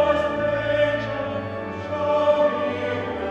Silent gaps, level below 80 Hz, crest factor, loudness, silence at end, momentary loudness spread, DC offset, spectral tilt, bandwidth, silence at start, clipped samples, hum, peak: none; -50 dBFS; 16 dB; -23 LUFS; 0 s; 10 LU; under 0.1%; -6.5 dB/octave; 7.8 kHz; 0 s; under 0.1%; none; -6 dBFS